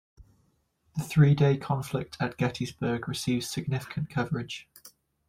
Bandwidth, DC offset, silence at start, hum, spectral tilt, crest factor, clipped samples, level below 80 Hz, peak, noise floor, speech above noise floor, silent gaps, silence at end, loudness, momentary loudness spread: 15.5 kHz; under 0.1%; 0.2 s; none; -6.5 dB/octave; 18 dB; under 0.1%; -58 dBFS; -10 dBFS; -70 dBFS; 43 dB; none; 0.4 s; -28 LUFS; 12 LU